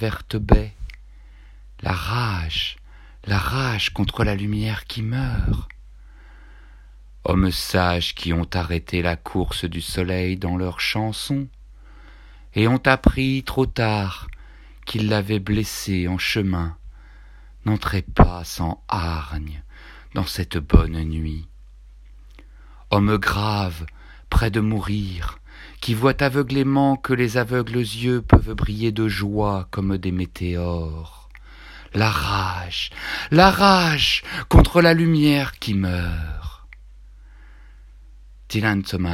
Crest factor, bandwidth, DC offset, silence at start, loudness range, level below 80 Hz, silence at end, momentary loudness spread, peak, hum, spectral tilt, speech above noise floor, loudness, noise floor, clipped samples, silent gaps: 22 dB; 16 kHz; under 0.1%; 0 s; 8 LU; -30 dBFS; 0 s; 14 LU; 0 dBFS; none; -6 dB/octave; 24 dB; -21 LUFS; -44 dBFS; under 0.1%; none